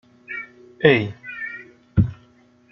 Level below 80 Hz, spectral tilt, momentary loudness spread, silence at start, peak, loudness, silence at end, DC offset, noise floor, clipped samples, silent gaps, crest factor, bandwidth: -42 dBFS; -8.5 dB/octave; 17 LU; 0.3 s; -2 dBFS; -22 LUFS; 0.6 s; under 0.1%; -55 dBFS; under 0.1%; none; 22 dB; 6 kHz